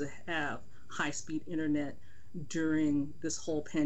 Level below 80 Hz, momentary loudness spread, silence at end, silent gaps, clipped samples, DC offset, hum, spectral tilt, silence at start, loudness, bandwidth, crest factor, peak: -62 dBFS; 14 LU; 0 s; none; under 0.1%; 1%; none; -4.5 dB/octave; 0 s; -35 LUFS; 8.4 kHz; 14 dB; -20 dBFS